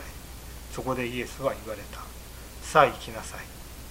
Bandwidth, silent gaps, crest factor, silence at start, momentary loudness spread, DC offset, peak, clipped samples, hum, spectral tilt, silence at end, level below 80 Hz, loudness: 16 kHz; none; 26 dB; 0 s; 21 LU; under 0.1%; -4 dBFS; under 0.1%; none; -4.5 dB/octave; 0 s; -44 dBFS; -28 LUFS